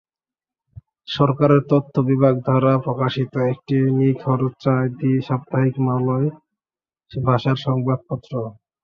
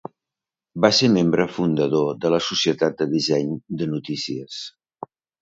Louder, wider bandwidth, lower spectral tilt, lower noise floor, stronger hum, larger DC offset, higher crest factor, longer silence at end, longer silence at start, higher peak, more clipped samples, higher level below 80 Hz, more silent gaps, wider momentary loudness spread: about the same, -20 LUFS vs -21 LUFS; second, 6.4 kHz vs 7.8 kHz; first, -9.5 dB/octave vs -5 dB/octave; about the same, under -90 dBFS vs -88 dBFS; neither; neither; about the same, 18 dB vs 20 dB; second, 0.3 s vs 0.75 s; first, 1.1 s vs 0.75 s; about the same, -2 dBFS vs -2 dBFS; neither; about the same, -56 dBFS vs -60 dBFS; neither; second, 9 LU vs 22 LU